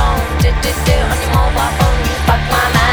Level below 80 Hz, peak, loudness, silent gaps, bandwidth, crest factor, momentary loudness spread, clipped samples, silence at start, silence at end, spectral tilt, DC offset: -16 dBFS; 0 dBFS; -14 LUFS; none; over 20 kHz; 12 dB; 2 LU; under 0.1%; 0 s; 0 s; -4.5 dB/octave; 0.9%